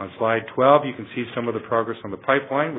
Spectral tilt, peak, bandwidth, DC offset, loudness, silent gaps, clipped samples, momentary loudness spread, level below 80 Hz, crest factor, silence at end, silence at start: -10 dB/octave; -2 dBFS; 4 kHz; under 0.1%; -22 LUFS; none; under 0.1%; 12 LU; -64 dBFS; 20 dB; 0 s; 0 s